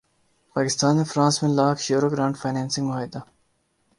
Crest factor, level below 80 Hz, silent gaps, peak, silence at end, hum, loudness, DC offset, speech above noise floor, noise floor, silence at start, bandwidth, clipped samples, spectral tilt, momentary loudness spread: 18 dB; -64 dBFS; none; -6 dBFS; 0.75 s; none; -23 LUFS; under 0.1%; 46 dB; -68 dBFS; 0.55 s; 11.5 kHz; under 0.1%; -5 dB/octave; 11 LU